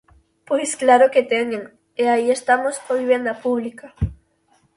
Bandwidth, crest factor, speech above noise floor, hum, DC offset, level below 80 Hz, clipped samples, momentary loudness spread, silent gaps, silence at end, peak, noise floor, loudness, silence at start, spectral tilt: 11.5 kHz; 18 dB; 43 dB; none; under 0.1%; -42 dBFS; under 0.1%; 14 LU; none; 0.6 s; -2 dBFS; -61 dBFS; -19 LUFS; 0.5 s; -4.5 dB/octave